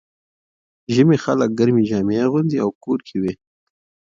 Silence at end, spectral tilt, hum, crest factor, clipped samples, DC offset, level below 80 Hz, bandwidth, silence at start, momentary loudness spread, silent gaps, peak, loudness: 0.8 s; -7.5 dB/octave; none; 16 dB; under 0.1%; under 0.1%; -56 dBFS; 7.6 kHz; 0.9 s; 9 LU; 2.75-2.81 s; -2 dBFS; -19 LUFS